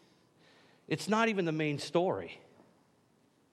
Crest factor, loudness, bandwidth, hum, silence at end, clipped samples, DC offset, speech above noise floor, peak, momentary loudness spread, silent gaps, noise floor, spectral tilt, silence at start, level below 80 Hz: 22 dB; -32 LUFS; 13 kHz; none; 1.15 s; under 0.1%; under 0.1%; 37 dB; -14 dBFS; 13 LU; none; -69 dBFS; -5.5 dB/octave; 0.9 s; -82 dBFS